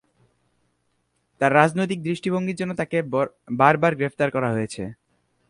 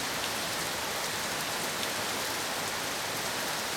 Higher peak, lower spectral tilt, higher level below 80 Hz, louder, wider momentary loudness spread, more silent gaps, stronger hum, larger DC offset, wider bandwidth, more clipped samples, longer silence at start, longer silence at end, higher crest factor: first, 0 dBFS vs -16 dBFS; first, -6.5 dB/octave vs -1 dB/octave; about the same, -60 dBFS vs -62 dBFS; first, -22 LUFS vs -31 LUFS; first, 10 LU vs 1 LU; neither; neither; neither; second, 11.5 kHz vs 19.5 kHz; neither; first, 1.4 s vs 0 s; first, 0.55 s vs 0 s; first, 22 dB vs 16 dB